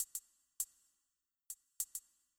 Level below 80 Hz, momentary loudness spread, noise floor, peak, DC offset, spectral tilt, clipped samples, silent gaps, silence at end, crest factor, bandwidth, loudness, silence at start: -84 dBFS; 10 LU; -88 dBFS; -24 dBFS; under 0.1%; 3.5 dB/octave; under 0.1%; none; 0.4 s; 26 dB; over 20 kHz; -45 LUFS; 0 s